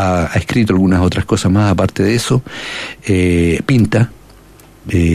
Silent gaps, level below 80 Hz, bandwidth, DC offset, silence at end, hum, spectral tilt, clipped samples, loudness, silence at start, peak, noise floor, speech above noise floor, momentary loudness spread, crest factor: none; -36 dBFS; 14 kHz; under 0.1%; 0 s; none; -6.5 dB/octave; under 0.1%; -14 LUFS; 0 s; -2 dBFS; -41 dBFS; 28 dB; 10 LU; 12 dB